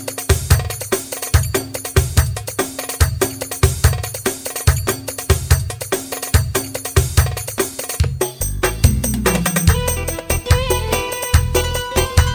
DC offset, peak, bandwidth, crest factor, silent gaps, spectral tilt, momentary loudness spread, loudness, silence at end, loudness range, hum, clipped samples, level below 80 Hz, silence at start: under 0.1%; 0 dBFS; over 20 kHz; 16 dB; none; -4 dB/octave; 6 LU; -18 LUFS; 0 s; 2 LU; none; under 0.1%; -24 dBFS; 0 s